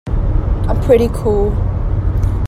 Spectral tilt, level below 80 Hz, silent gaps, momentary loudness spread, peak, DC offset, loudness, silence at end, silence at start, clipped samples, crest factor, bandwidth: -8.5 dB/octave; -18 dBFS; none; 6 LU; 0 dBFS; under 0.1%; -16 LUFS; 0 s; 0.05 s; under 0.1%; 14 dB; 14 kHz